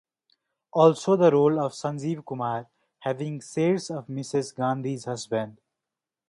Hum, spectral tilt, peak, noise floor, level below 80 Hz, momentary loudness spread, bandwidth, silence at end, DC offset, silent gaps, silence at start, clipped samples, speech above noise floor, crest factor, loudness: none; -6.5 dB/octave; -6 dBFS; -88 dBFS; -72 dBFS; 13 LU; 11.5 kHz; 0.75 s; under 0.1%; none; 0.75 s; under 0.1%; 64 dB; 20 dB; -26 LUFS